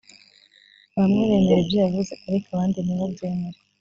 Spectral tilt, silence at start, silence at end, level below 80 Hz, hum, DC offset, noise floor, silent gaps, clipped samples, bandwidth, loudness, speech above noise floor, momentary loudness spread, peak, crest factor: -7.5 dB/octave; 0.95 s; 0.3 s; -52 dBFS; none; under 0.1%; -55 dBFS; none; under 0.1%; 7.4 kHz; -22 LUFS; 34 dB; 11 LU; -6 dBFS; 16 dB